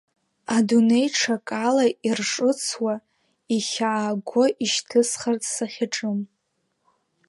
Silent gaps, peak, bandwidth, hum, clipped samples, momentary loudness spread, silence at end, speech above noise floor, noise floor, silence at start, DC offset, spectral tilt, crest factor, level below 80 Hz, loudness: none; -6 dBFS; 11.5 kHz; none; under 0.1%; 8 LU; 1.05 s; 51 dB; -74 dBFS; 0.5 s; under 0.1%; -3.5 dB/octave; 16 dB; -74 dBFS; -23 LUFS